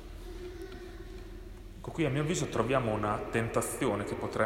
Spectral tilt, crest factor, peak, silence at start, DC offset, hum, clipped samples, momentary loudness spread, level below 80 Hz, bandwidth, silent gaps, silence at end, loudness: -5.5 dB/octave; 18 dB; -14 dBFS; 0 s; under 0.1%; none; under 0.1%; 17 LU; -48 dBFS; 16 kHz; none; 0 s; -32 LUFS